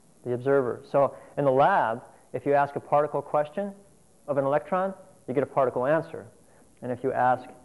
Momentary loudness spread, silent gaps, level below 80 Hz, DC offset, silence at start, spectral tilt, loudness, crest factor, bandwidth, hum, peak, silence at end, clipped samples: 14 LU; none; -68 dBFS; under 0.1%; 0.25 s; -7.5 dB/octave; -26 LUFS; 16 dB; 11.5 kHz; none; -10 dBFS; 0.1 s; under 0.1%